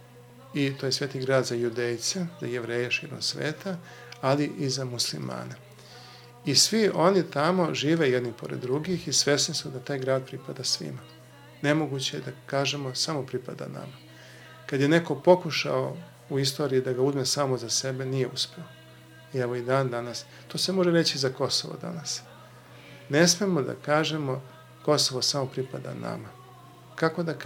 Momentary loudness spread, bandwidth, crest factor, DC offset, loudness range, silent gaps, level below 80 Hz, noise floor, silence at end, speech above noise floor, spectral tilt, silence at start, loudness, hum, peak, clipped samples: 16 LU; 17 kHz; 22 dB; under 0.1%; 5 LU; none; -70 dBFS; -50 dBFS; 0 s; 23 dB; -4 dB/octave; 0 s; -27 LUFS; none; -6 dBFS; under 0.1%